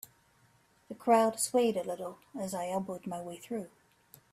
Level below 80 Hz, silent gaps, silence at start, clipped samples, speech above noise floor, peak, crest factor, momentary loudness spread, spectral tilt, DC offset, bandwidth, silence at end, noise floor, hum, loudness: -76 dBFS; none; 0.9 s; under 0.1%; 35 dB; -12 dBFS; 20 dB; 16 LU; -4 dB/octave; under 0.1%; 15.5 kHz; 0.65 s; -67 dBFS; none; -32 LUFS